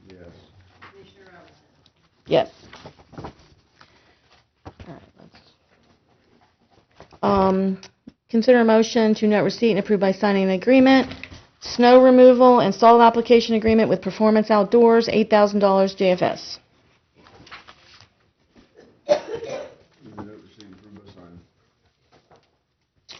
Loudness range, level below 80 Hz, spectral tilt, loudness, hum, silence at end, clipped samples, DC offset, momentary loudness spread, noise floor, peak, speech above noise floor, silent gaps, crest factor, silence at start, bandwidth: 17 LU; -56 dBFS; -4.5 dB/octave; -17 LUFS; none; 2.95 s; under 0.1%; under 0.1%; 22 LU; -70 dBFS; -2 dBFS; 53 dB; none; 18 dB; 2.3 s; 6.4 kHz